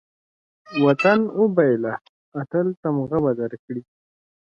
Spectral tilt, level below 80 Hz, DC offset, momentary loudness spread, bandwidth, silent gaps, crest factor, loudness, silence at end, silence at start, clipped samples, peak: -8 dB/octave; -62 dBFS; under 0.1%; 16 LU; 7 kHz; 2.09-2.32 s, 2.77-2.83 s, 3.59-3.68 s; 20 dB; -21 LUFS; 0.7 s; 0.7 s; under 0.1%; -2 dBFS